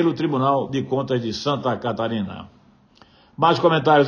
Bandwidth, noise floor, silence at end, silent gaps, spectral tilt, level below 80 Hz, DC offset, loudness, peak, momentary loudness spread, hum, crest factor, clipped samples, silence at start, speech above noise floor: 7.2 kHz; -53 dBFS; 0 s; none; -6.5 dB/octave; -60 dBFS; under 0.1%; -21 LUFS; -4 dBFS; 9 LU; none; 18 dB; under 0.1%; 0 s; 33 dB